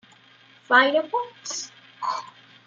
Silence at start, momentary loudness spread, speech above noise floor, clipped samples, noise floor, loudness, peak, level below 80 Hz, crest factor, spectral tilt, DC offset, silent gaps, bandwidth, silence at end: 0.7 s; 15 LU; 31 dB; under 0.1%; -54 dBFS; -23 LUFS; -4 dBFS; -82 dBFS; 22 dB; -1 dB/octave; under 0.1%; none; 9.4 kHz; 0.4 s